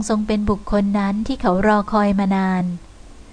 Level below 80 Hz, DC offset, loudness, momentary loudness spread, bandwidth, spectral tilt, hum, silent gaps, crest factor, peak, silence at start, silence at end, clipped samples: -36 dBFS; under 0.1%; -19 LUFS; 5 LU; 10 kHz; -6.5 dB/octave; none; none; 14 dB; -4 dBFS; 0 s; 0 s; under 0.1%